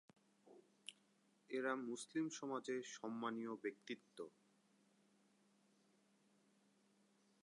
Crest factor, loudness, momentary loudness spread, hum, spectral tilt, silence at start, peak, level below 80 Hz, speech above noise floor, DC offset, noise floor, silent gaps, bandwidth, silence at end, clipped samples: 22 dB; -47 LUFS; 14 LU; none; -4 dB/octave; 0.45 s; -30 dBFS; under -90 dBFS; 31 dB; under 0.1%; -78 dBFS; none; 11 kHz; 3.15 s; under 0.1%